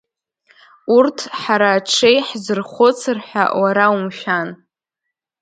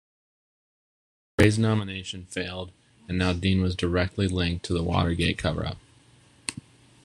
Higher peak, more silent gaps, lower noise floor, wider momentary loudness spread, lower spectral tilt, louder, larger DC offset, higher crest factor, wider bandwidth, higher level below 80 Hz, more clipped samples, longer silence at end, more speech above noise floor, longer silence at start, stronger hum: about the same, 0 dBFS vs -2 dBFS; neither; first, -80 dBFS vs -57 dBFS; second, 9 LU vs 13 LU; second, -3.5 dB/octave vs -5.5 dB/octave; first, -16 LUFS vs -26 LUFS; neither; second, 18 dB vs 24 dB; second, 9.4 kHz vs 12.5 kHz; second, -70 dBFS vs -44 dBFS; neither; first, 0.85 s vs 0.45 s; first, 64 dB vs 32 dB; second, 0.85 s vs 1.4 s; neither